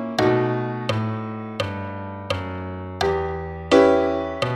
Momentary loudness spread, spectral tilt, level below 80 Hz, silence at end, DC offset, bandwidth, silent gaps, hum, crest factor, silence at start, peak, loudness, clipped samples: 14 LU; -6.5 dB/octave; -46 dBFS; 0 s; under 0.1%; 13 kHz; none; none; 20 dB; 0 s; -2 dBFS; -23 LUFS; under 0.1%